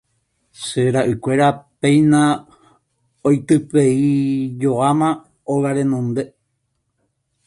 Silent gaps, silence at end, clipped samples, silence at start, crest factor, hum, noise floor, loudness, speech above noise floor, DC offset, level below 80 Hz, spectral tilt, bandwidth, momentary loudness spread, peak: none; 1.2 s; under 0.1%; 0.6 s; 16 dB; none; -71 dBFS; -17 LUFS; 55 dB; under 0.1%; -56 dBFS; -6.5 dB/octave; 11.5 kHz; 10 LU; -2 dBFS